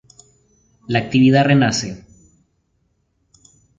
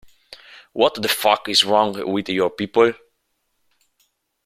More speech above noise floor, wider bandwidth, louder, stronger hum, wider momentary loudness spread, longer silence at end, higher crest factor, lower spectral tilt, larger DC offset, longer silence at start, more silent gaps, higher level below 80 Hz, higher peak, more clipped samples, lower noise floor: about the same, 51 dB vs 52 dB; second, 7.8 kHz vs 16 kHz; about the same, -16 LUFS vs -18 LUFS; neither; first, 16 LU vs 8 LU; first, 1.8 s vs 1.5 s; about the same, 18 dB vs 20 dB; first, -5.5 dB/octave vs -3 dB/octave; neither; first, 0.9 s vs 0.3 s; neither; first, -52 dBFS vs -62 dBFS; about the same, -2 dBFS vs -2 dBFS; neither; second, -66 dBFS vs -71 dBFS